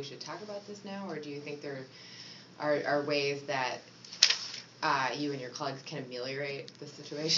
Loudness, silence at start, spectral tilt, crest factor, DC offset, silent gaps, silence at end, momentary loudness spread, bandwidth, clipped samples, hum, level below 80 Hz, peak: -33 LUFS; 0 s; -1.5 dB/octave; 34 dB; under 0.1%; none; 0 s; 19 LU; 7.6 kHz; under 0.1%; none; -86 dBFS; 0 dBFS